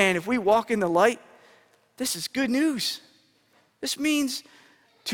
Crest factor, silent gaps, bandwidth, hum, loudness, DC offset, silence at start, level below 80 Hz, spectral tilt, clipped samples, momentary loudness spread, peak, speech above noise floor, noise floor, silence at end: 22 dB; none; 19.5 kHz; none; -25 LUFS; under 0.1%; 0 s; -66 dBFS; -3.5 dB/octave; under 0.1%; 13 LU; -6 dBFS; 39 dB; -64 dBFS; 0 s